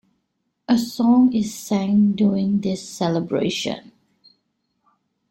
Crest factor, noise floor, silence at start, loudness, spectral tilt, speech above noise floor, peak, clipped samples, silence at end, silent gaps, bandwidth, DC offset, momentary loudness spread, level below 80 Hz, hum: 14 dB; -74 dBFS; 0.7 s; -20 LUFS; -6 dB/octave; 54 dB; -6 dBFS; under 0.1%; 1.5 s; none; 16.5 kHz; under 0.1%; 10 LU; -60 dBFS; none